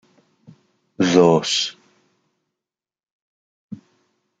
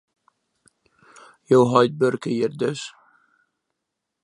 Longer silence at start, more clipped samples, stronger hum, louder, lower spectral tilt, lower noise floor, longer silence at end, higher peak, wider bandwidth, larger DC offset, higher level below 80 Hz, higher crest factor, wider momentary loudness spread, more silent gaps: second, 1 s vs 1.5 s; neither; neither; first, -17 LUFS vs -20 LUFS; second, -4.5 dB/octave vs -6.5 dB/octave; first, -87 dBFS vs -81 dBFS; second, 0.65 s vs 1.35 s; about the same, 0 dBFS vs -2 dBFS; second, 9.2 kHz vs 11 kHz; neither; about the same, -64 dBFS vs -68 dBFS; about the same, 22 dB vs 22 dB; first, 26 LU vs 13 LU; first, 3.11-3.69 s vs none